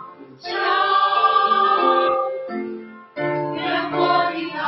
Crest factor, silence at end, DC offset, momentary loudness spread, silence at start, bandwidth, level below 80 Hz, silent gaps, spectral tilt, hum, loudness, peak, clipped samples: 16 dB; 0 s; under 0.1%; 13 LU; 0 s; 6 kHz; -70 dBFS; none; -6.5 dB/octave; none; -19 LUFS; -6 dBFS; under 0.1%